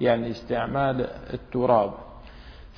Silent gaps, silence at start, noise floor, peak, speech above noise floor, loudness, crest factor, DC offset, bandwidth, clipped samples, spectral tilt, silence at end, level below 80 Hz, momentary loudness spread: none; 0 s; -44 dBFS; -6 dBFS; 19 dB; -25 LUFS; 20 dB; under 0.1%; 5.4 kHz; under 0.1%; -8.5 dB/octave; 0.05 s; -46 dBFS; 24 LU